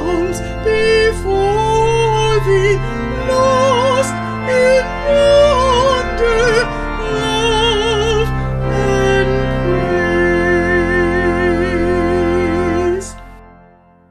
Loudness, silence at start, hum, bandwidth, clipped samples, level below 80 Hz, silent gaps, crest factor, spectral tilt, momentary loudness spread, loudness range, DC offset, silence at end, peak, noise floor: -14 LUFS; 0 s; none; 13.5 kHz; under 0.1%; -26 dBFS; none; 14 dB; -5.5 dB/octave; 6 LU; 2 LU; under 0.1%; 0.7 s; 0 dBFS; -46 dBFS